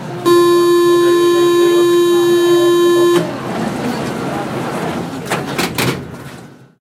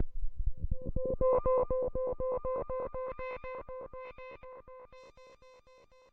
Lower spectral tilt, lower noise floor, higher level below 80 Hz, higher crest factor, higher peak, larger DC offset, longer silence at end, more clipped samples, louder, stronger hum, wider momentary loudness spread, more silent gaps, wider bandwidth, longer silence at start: second, -5 dB/octave vs -9.5 dB/octave; second, -36 dBFS vs -61 dBFS; second, -54 dBFS vs -42 dBFS; about the same, 14 dB vs 16 dB; first, 0 dBFS vs -18 dBFS; neither; second, 0.35 s vs 0.6 s; neither; first, -13 LUFS vs -35 LUFS; neither; second, 10 LU vs 22 LU; neither; first, 16 kHz vs 4.4 kHz; about the same, 0 s vs 0 s